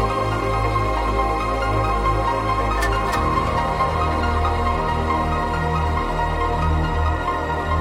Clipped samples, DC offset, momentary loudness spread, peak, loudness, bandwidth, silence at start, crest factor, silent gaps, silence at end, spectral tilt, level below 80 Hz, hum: under 0.1%; under 0.1%; 2 LU; -8 dBFS; -21 LUFS; 15.5 kHz; 0 s; 12 dB; none; 0 s; -6.5 dB/octave; -26 dBFS; none